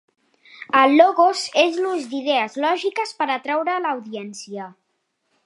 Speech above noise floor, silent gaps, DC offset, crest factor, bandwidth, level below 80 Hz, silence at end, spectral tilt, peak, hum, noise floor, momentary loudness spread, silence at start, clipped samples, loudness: 53 dB; none; under 0.1%; 20 dB; 11.5 kHz; -80 dBFS; 0.75 s; -3 dB/octave; -2 dBFS; none; -72 dBFS; 19 LU; 0.6 s; under 0.1%; -19 LUFS